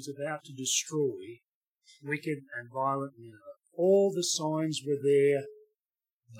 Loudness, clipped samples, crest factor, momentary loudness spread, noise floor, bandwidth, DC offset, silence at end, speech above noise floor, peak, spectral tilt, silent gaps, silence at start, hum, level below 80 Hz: -30 LUFS; under 0.1%; 16 dB; 20 LU; under -90 dBFS; 16 kHz; under 0.1%; 0 s; over 60 dB; -16 dBFS; -4 dB/octave; 1.54-1.75 s, 6.13-6.21 s; 0 s; none; -88 dBFS